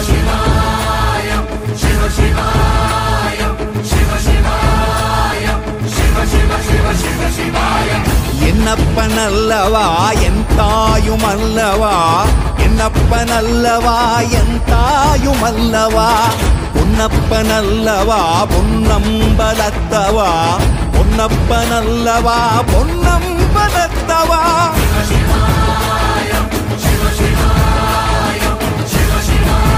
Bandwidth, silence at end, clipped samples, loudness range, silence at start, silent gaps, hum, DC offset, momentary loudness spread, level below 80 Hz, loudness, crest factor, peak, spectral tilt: 16 kHz; 0 s; under 0.1%; 2 LU; 0 s; none; none; under 0.1%; 4 LU; -16 dBFS; -13 LUFS; 12 dB; 0 dBFS; -5 dB/octave